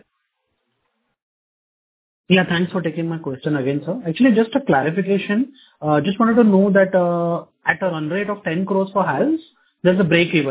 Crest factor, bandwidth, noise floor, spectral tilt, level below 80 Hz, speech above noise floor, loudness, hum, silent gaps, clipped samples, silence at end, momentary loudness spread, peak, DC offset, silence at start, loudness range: 18 dB; 4 kHz; -73 dBFS; -11 dB/octave; -58 dBFS; 55 dB; -18 LUFS; none; none; under 0.1%; 0 s; 9 LU; -2 dBFS; under 0.1%; 2.3 s; 6 LU